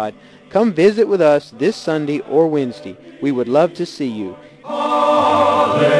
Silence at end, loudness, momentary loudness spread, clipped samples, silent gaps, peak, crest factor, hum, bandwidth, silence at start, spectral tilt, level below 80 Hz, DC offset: 0 s; -16 LUFS; 14 LU; under 0.1%; none; -2 dBFS; 14 dB; none; 11 kHz; 0 s; -6 dB/octave; -62 dBFS; under 0.1%